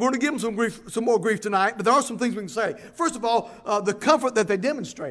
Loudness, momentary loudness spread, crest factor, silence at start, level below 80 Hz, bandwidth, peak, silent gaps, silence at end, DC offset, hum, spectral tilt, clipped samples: -24 LUFS; 7 LU; 20 dB; 0 s; -64 dBFS; 11 kHz; -4 dBFS; none; 0 s; under 0.1%; none; -4 dB/octave; under 0.1%